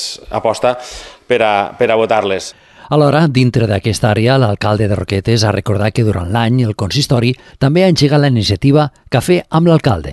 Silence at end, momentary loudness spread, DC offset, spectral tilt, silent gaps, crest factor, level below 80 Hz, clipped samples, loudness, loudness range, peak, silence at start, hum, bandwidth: 0 s; 7 LU; under 0.1%; -6 dB/octave; none; 12 dB; -34 dBFS; under 0.1%; -13 LUFS; 2 LU; 0 dBFS; 0 s; none; 12.5 kHz